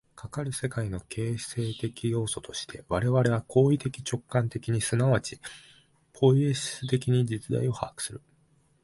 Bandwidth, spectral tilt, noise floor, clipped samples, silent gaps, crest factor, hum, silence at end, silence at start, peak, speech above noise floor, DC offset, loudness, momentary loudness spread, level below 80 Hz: 11.5 kHz; -6 dB/octave; -65 dBFS; under 0.1%; none; 20 dB; none; 0.65 s; 0.15 s; -8 dBFS; 38 dB; under 0.1%; -28 LUFS; 13 LU; -54 dBFS